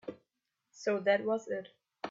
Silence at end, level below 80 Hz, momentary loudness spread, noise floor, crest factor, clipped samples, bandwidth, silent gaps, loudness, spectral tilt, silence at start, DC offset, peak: 0 s; -82 dBFS; 15 LU; -85 dBFS; 20 dB; under 0.1%; 7.6 kHz; none; -33 LUFS; -5 dB/octave; 0.05 s; under 0.1%; -16 dBFS